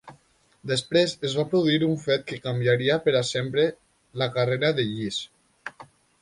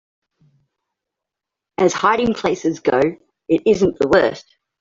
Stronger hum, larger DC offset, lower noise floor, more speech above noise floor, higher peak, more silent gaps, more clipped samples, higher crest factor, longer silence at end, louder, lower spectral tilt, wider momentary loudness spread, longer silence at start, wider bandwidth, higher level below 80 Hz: neither; neither; second, -61 dBFS vs -85 dBFS; second, 37 dB vs 68 dB; second, -8 dBFS vs -2 dBFS; neither; neither; about the same, 16 dB vs 18 dB; about the same, 0.4 s vs 0.4 s; second, -24 LUFS vs -17 LUFS; about the same, -5.5 dB/octave vs -5 dB/octave; first, 19 LU vs 8 LU; second, 0.05 s vs 1.8 s; first, 11.5 kHz vs 7.8 kHz; second, -62 dBFS vs -50 dBFS